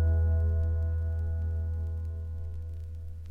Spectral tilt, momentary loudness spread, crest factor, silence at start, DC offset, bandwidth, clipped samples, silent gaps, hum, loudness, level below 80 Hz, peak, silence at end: -10 dB/octave; 13 LU; 10 dB; 0 s; under 0.1%; 1.8 kHz; under 0.1%; none; none; -32 LUFS; -32 dBFS; -18 dBFS; 0 s